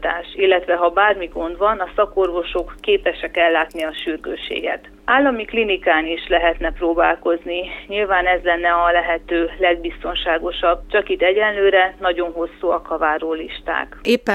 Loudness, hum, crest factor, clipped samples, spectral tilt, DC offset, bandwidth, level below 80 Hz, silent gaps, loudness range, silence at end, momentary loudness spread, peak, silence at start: -19 LUFS; none; 16 dB; under 0.1%; -5 dB/octave; under 0.1%; 12.5 kHz; -38 dBFS; none; 2 LU; 0 s; 9 LU; -2 dBFS; 0 s